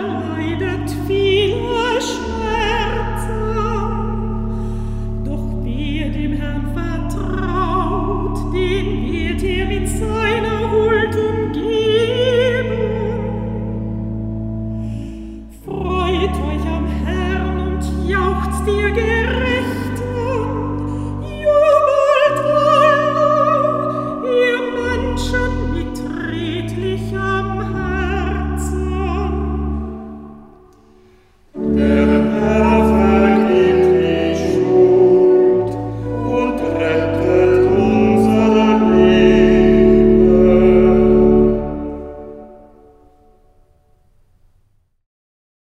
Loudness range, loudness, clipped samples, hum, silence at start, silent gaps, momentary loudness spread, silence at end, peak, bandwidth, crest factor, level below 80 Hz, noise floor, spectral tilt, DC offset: 10 LU; -16 LUFS; under 0.1%; none; 0 s; none; 13 LU; 3.15 s; 0 dBFS; 13.5 kHz; 16 dB; -28 dBFS; -58 dBFS; -7 dB/octave; under 0.1%